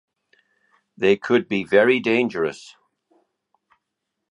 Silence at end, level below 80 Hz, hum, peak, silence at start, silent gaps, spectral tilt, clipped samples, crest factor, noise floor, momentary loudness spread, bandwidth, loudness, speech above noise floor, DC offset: 1.75 s; -66 dBFS; none; -2 dBFS; 1 s; none; -6 dB/octave; under 0.1%; 22 dB; -80 dBFS; 10 LU; 10.5 kHz; -20 LUFS; 61 dB; under 0.1%